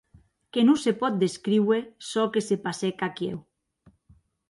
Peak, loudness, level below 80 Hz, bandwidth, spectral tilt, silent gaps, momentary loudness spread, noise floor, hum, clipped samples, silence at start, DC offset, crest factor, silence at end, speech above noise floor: -10 dBFS; -26 LUFS; -68 dBFS; 11.5 kHz; -5.5 dB/octave; none; 11 LU; -61 dBFS; none; under 0.1%; 0.55 s; under 0.1%; 18 dB; 1.1 s; 36 dB